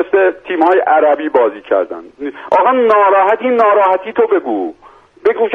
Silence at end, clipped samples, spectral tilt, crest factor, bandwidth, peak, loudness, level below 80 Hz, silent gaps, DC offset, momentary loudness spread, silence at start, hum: 0 s; under 0.1%; -6 dB/octave; 12 dB; 5.8 kHz; 0 dBFS; -12 LUFS; -58 dBFS; none; under 0.1%; 11 LU; 0 s; none